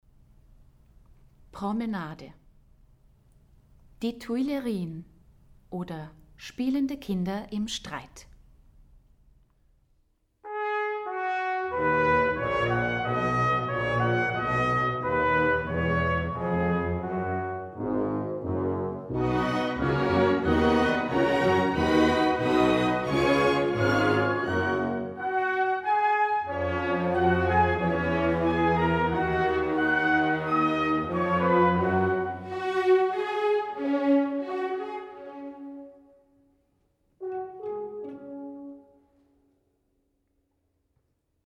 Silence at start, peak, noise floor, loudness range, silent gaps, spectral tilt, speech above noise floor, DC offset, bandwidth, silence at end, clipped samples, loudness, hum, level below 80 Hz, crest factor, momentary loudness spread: 1.55 s; -10 dBFS; -73 dBFS; 15 LU; none; -6.5 dB/octave; 42 dB; under 0.1%; 13.5 kHz; 2.65 s; under 0.1%; -26 LUFS; none; -48 dBFS; 18 dB; 15 LU